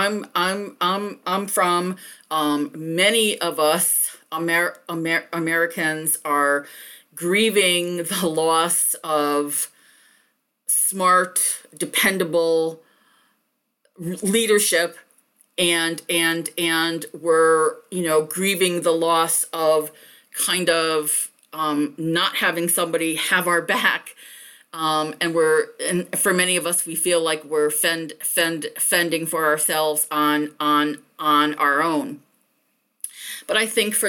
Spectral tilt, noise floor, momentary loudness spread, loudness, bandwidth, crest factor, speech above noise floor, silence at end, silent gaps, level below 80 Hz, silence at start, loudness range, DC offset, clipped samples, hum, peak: -2.5 dB/octave; -72 dBFS; 10 LU; -20 LUFS; 19 kHz; 16 dB; 51 dB; 0 s; none; -72 dBFS; 0 s; 2 LU; under 0.1%; under 0.1%; none; -4 dBFS